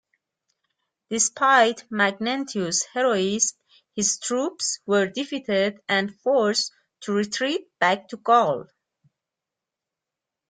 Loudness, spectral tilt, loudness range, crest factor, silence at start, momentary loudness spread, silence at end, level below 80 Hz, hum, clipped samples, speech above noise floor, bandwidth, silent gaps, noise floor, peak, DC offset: -23 LUFS; -2.5 dB/octave; 3 LU; 20 dB; 1.1 s; 8 LU; 1.85 s; -70 dBFS; none; under 0.1%; 64 dB; 10 kHz; none; -87 dBFS; -6 dBFS; under 0.1%